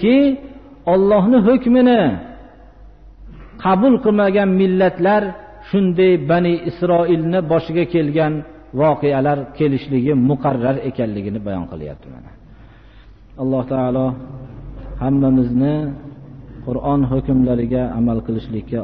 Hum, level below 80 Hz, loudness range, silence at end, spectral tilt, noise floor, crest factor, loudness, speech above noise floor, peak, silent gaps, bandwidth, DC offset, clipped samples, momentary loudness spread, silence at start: none; -40 dBFS; 8 LU; 0 s; -7 dB/octave; -43 dBFS; 14 dB; -17 LUFS; 27 dB; -4 dBFS; none; 5.2 kHz; 0.2%; under 0.1%; 16 LU; 0 s